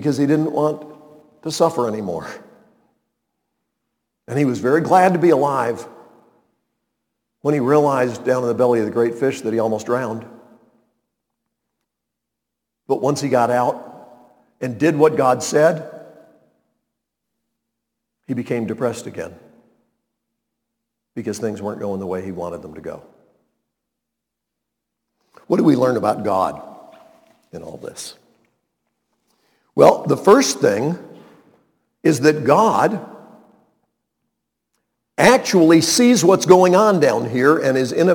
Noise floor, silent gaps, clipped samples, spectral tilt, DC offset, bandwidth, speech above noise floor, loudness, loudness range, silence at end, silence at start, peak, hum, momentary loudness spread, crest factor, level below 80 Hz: -81 dBFS; none; under 0.1%; -5 dB/octave; under 0.1%; 19 kHz; 65 dB; -17 LUFS; 13 LU; 0 s; 0 s; 0 dBFS; none; 19 LU; 20 dB; -64 dBFS